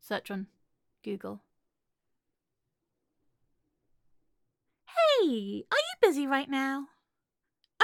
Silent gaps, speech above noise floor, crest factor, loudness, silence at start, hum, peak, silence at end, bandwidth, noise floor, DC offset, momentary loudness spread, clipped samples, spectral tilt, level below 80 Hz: none; 56 dB; 24 dB; -29 LUFS; 0.05 s; none; -8 dBFS; 0 s; 17.5 kHz; -87 dBFS; under 0.1%; 20 LU; under 0.1%; -4 dB/octave; -80 dBFS